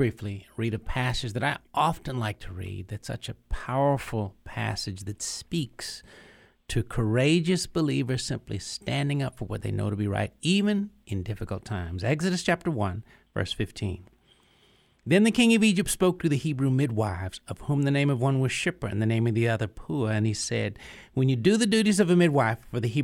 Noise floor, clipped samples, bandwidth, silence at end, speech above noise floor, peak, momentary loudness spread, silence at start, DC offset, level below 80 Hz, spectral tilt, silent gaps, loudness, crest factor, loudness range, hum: -62 dBFS; under 0.1%; 16 kHz; 0 s; 36 dB; -6 dBFS; 14 LU; 0 s; under 0.1%; -46 dBFS; -5.5 dB/octave; none; -27 LUFS; 20 dB; 6 LU; none